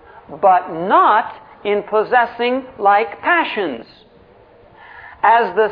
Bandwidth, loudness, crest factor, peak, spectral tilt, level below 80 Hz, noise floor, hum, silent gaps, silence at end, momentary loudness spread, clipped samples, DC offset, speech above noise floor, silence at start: 5.2 kHz; -16 LUFS; 16 dB; -2 dBFS; -7.5 dB/octave; -58 dBFS; -47 dBFS; none; none; 0 s; 9 LU; under 0.1%; under 0.1%; 31 dB; 0.3 s